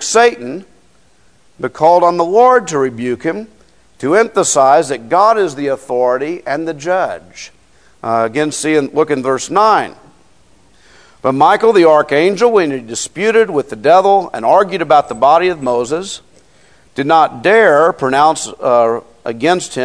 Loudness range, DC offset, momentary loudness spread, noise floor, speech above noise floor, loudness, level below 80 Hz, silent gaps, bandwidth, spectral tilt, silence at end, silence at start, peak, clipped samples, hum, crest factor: 4 LU; 0.3%; 12 LU; -52 dBFS; 40 dB; -12 LUFS; -56 dBFS; none; 11 kHz; -4 dB/octave; 0 s; 0 s; 0 dBFS; 0.3%; none; 14 dB